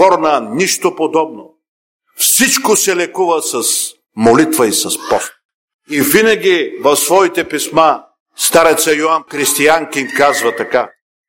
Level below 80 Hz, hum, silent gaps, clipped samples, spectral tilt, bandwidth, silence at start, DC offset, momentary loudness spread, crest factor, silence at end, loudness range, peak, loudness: -54 dBFS; none; 1.68-1.99 s, 5.45-5.68 s, 5.74-5.79 s, 8.20-8.26 s; under 0.1%; -2 dB/octave; 17.5 kHz; 0 s; under 0.1%; 7 LU; 14 dB; 0.4 s; 2 LU; 0 dBFS; -12 LUFS